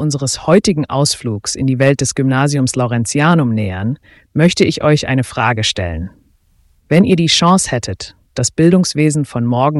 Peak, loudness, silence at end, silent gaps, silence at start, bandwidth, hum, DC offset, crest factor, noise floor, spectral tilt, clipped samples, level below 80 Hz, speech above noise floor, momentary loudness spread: 0 dBFS; -14 LUFS; 0 s; none; 0 s; 12 kHz; none; under 0.1%; 14 dB; -54 dBFS; -5 dB/octave; under 0.1%; -40 dBFS; 40 dB; 11 LU